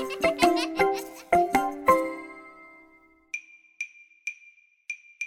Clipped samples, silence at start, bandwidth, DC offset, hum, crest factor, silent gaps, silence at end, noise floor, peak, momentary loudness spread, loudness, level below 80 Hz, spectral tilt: under 0.1%; 0 s; 17 kHz; under 0.1%; none; 22 dB; none; 0 s; -58 dBFS; -6 dBFS; 17 LU; -26 LUFS; -58 dBFS; -3.5 dB/octave